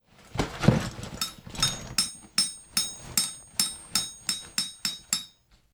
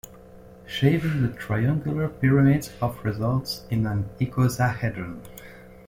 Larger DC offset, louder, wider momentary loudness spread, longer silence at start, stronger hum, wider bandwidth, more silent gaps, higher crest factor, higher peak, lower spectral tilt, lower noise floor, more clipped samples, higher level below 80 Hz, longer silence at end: neither; second, -28 LUFS vs -24 LUFS; second, 8 LU vs 15 LU; first, 0.2 s vs 0.05 s; neither; first, over 20 kHz vs 16.5 kHz; neither; first, 26 dB vs 18 dB; about the same, -4 dBFS vs -6 dBFS; second, -2.5 dB/octave vs -7 dB/octave; first, -55 dBFS vs -46 dBFS; neither; about the same, -48 dBFS vs -48 dBFS; first, 0.45 s vs 0.05 s